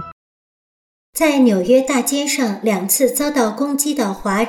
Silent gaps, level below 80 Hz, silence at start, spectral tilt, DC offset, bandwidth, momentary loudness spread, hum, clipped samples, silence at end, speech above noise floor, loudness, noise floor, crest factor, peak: 0.12-1.13 s; -52 dBFS; 0 s; -3.5 dB/octave; under 0.1%; 18 kHz; 6 LU; none; under 0.1%; 0 s; over 74 dB; -16 LUFS; under -90 dBFS; 14 dB; -4 dBFS